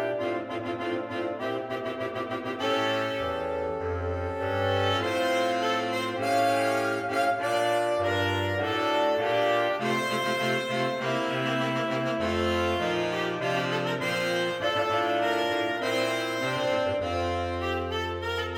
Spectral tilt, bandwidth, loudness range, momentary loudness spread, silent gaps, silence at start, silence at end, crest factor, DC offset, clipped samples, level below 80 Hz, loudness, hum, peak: -5 dB/octave; 17 kHz; 4 LU; 6 LU; none; 0 s; 0 s; 14 dB; under 0.1%; under 0.1%; -54 dBFS; -27 LUFS; none; -14 dBFS